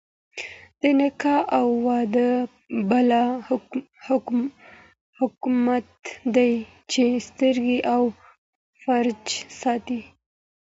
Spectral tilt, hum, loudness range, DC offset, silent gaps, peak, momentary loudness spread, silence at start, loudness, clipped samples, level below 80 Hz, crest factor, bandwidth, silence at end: -4.5 dB/octave; none; 3 LU; under 0.1%; 5.01-5.13 s, 8.38-8.73 s; -6 dBFS; 12 LU; 0.35 s; -23 LUFS; under 0.1%; -64 dBFS; 18 dB; 8 kHz; 0.75 s